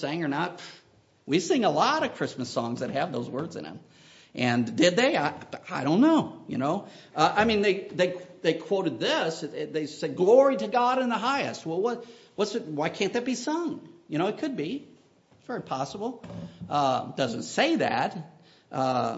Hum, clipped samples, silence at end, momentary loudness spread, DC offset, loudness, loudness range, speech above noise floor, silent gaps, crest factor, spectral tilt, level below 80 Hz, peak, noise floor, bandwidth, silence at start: none; under 0.1%; 0 s; 15 LU; under 0.1%; -27 LUFS; 6 LU; 33 dB; none; 20 dB; -5 dB/octave; -66 dBFS; -6 dBFS; -60 dBFS; 8 kHz; 0 s